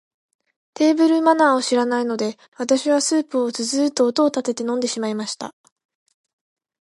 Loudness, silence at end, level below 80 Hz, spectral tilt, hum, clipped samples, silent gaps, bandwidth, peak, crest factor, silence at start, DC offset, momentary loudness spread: -20 LUFS; 1.3 s; -76 dBFS; -3 dB/octave; none; under 0.1%; 2.48-2.52 s; 11.5 kHz; -2 dBFS; 18 dB; 0.8 s; under 0.1%; 11 LU